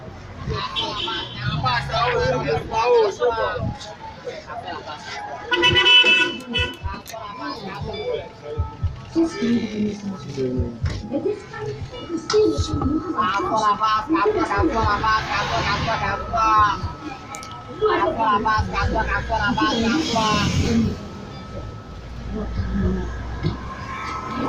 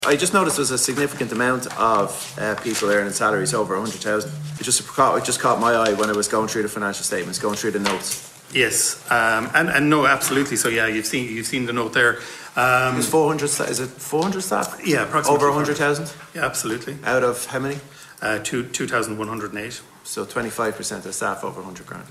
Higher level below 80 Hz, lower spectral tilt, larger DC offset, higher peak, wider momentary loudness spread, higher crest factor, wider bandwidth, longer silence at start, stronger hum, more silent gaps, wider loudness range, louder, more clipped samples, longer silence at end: first, -36 dBFS vs -56 dBFS; first, -4.5 dB/octave vs -3 dB/octave; neither; about the same, -2 dBFS vs -4 dBFS; first, 15 LU vs 10 LU; about the same, 20 dB vs 18 dB; about the same, 15.5 kHz vs 16 kHz; about the same, 0 s vs 0 s; neither; neither; about the same, 8 LU vs 7 LU; about the same, -21 LUFS vs -21 LUFS; neither; about the same, 0 s vs 0 s